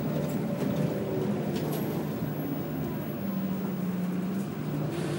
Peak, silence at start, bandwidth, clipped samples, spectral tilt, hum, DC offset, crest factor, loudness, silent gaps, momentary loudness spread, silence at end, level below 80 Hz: -16 dBFS; 0 s; 16 kHz; under 0.1%; -7.5 dB/octave; none; under 0.1%; 14 dB; -31 LUFS; none; 3 LU; 0 s; -60 dBFS